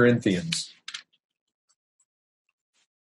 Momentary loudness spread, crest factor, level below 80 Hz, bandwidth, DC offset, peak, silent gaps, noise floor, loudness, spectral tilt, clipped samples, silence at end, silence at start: 17 LU; 22 dB; -70 dBFS; 11.5 kHz; under 0.1%; -8 dBFS; none; -44 dBFS; -26 LUFS; -5 dB/octave; under 0.1%; 2.05 s; 0 s